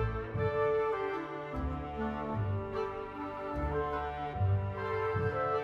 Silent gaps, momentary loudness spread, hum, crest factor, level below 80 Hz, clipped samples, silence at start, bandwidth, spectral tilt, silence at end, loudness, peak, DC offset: none; 7 LU; none; 14 dB; -46 dBFS; under 0.1%; 0 s; 6.2 kHz; -9 dB/octave; 0 s; -35 LUFS; -20 dBFS; under 0.1%